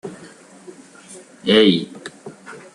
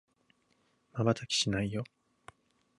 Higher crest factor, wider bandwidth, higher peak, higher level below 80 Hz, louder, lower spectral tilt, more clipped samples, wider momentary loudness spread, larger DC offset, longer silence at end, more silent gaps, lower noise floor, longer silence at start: about the same, 20 dB vs 22 dB; about the same, 11.5 kHz vs 11.5 kHz; first, -2 dBFS vs -14 dBFS; about the same, -64 dBFS vs -60 dBFS; first, -16 LUFS vs -32 LUFS; about the same, -5 dB/octave vs -4.5 dB/octave; neither; first, 27 LU vs 14 LU; neither; second, 0.15 s vs 0.95 s; neither; second, -43 dBFS vs -73 dBFS; second, 0.05 s vs 0.95 s